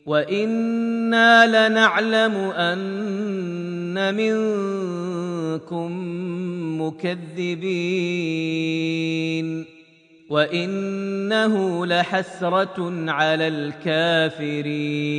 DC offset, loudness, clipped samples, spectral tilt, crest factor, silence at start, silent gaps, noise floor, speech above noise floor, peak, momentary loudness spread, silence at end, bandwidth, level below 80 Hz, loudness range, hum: under 0.1%; -21 LUFS; under 0.1%; -5.5 dB/octave; 20 dB; 0.05 s; none; -52 dBFS; 30 dB; -2 dBFS; 11 LU; 0 s; 10 kHz; -72 dBFS; 8 LU; none